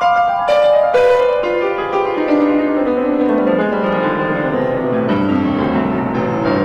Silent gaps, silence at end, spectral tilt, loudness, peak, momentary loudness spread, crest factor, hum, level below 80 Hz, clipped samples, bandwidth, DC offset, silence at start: none; 0 s; -7.5 dB/octave; -15 LUFS; -2 dBFS; 5 LU; 12 dB; none; -44 dBFS; under 0.1%; 8.4 kHz; under 0.1%; 0 s